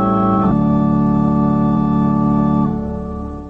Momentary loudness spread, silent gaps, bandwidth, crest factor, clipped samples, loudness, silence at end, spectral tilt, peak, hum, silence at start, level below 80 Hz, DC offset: 8 LU; none; 4.2 kHz; 10 dB; under 0.1%; -16 LUFS; 0 s; -11 dB/octave; -4 dBFS; none; 0 s; -32 dBFS; under 0.1%